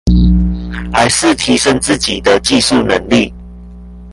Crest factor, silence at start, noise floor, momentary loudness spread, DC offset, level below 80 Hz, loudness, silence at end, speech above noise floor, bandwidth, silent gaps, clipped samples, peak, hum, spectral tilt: 12 dB; 0.05 s; -31 dBFS; 6 LU; under 0.1%; -20 dBFS; -12 LUFS; 0 s; 20 dB; 11.5 kHz; none; under 0.1%; 0 dBFS; 60 Hz at -30 dBFS; -4 dB/octave